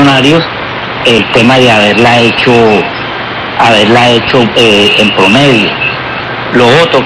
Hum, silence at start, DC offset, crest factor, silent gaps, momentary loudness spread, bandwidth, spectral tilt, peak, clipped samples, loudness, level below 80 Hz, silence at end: none; 0 s; under 0.1%; 6 dB; none; 10 LU; 14 kHz; -5 dB/octave; 0 dBFS; 2%; -6 LUFS; -38 dBFS; 0 s